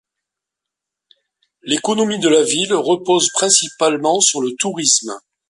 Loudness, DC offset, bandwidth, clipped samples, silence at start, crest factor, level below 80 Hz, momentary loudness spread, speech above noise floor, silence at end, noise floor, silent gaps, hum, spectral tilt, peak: -15 LUFS; under 0.1%; 11.5 kHz; under 0.1%; 1.65 s; 18 dB; -66 dBFS; 7 LU; 67 dB; 0.3 s; -83 dBFS; none; none; -2 dB/octave; 0 dBFS